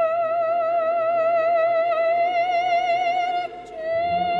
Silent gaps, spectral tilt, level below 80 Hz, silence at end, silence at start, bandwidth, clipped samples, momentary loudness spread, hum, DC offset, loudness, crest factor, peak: none; -4.5 dB/octave; -62 dBFS; 0 s; 0 s; 6.2 kHz; under 0.1%; 6 LU; none; under 0.1%; -21 LUFS; 8 dB; -12 dBFS